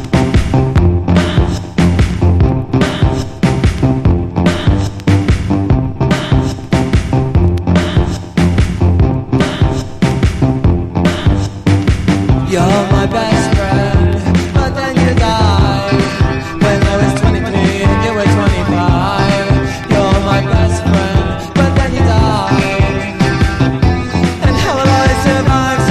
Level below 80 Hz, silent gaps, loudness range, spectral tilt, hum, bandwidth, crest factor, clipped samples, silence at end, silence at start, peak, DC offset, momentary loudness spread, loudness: -18 dBFS; none; 1 LU; -6.5 dB/octave; none; 13 kHz; 10 dB; under 0.1%; 0 s; 0 s; -2 dBFS; under 0.1%; 3 LU; -12 LUFS